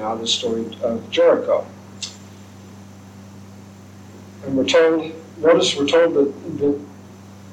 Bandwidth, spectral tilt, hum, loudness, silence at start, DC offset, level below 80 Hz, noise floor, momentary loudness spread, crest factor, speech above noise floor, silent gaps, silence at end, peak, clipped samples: 10 kHz; -4 dB/octave; none; -18 LUFS; 0 s; under 0.1%; -64 dBFS; -41 dBFS; 25 LU; 18 dB; 23 dB; none; 0 s; -4 dBFS; under 0.1%